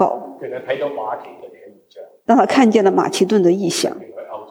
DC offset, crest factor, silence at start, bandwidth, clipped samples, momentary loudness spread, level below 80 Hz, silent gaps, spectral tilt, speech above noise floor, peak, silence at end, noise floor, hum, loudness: under 0.1%; 16 dB; 0 s; 20 kHz; under 0.1%; 18 LU; -68 dBFS; none; -5 dB/octave; 25 dB; -2 dBFS; 0.05 s; -41 dBFS; none; -16 LUFS